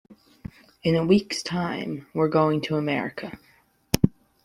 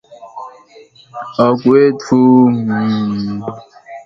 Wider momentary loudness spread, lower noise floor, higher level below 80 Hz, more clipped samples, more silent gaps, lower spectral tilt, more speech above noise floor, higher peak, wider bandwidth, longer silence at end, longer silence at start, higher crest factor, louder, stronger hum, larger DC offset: second, 20 LU vs 23 LU; about the same, -43 dBFS vs -43 dBFS; about the same, -52 dBFS vs -54 dBFS; neither; neither; second, -6 dB/octave vs -8 dB/octave; second, 19 dB vs 31 dB; about the same, -2 dBFS vs 0 dBFS; first, 15.5 kHz vs 7.6 kHz; first, 0.35 s vs 0.05 s; about the same, 0.1 s vs 0.1 s; first, 24 dB vs 14 dB; second, -25 LUFS vs -13 LUFS; neither; neither